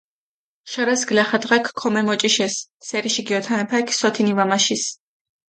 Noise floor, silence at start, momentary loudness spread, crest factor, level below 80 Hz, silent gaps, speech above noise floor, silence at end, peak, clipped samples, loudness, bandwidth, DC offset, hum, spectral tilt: under -90 dBFS; 0.65 s; 7 LU; 18 dB; -70 dBFS; 2.70-2.80 s; over 70 dB; 0.55 s; -4 dBFS; under 0.1%; -20 LUFS; 9.4 kHz; under 0.1%; none; -2.5 dB/octave